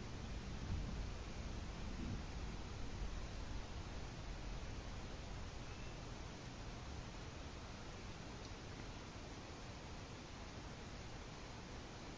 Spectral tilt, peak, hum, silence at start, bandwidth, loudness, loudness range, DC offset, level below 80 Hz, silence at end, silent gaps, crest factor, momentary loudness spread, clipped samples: -5 dB/octave; -30 dBFS; none; 0 s; 8 kHz; -51 LUFS; 3 LU; under 0.1%; -52 dBFS; 0 s; none; 18 dB; 5 LU; under 0.1%